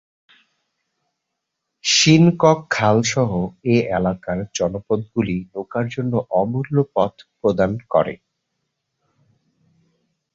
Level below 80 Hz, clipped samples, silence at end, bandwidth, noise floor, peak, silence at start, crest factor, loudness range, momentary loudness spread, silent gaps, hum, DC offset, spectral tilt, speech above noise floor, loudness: -50 dBFS; under 0.1%; 2.2 s; 7.8 kHz; -79 dBFS; -2 dBFS; 1.85 s; 18 dB; 6 LU; 12 LU; none; none; under 0.1%; -5 dB/octave; 60 dB; -19 LUFS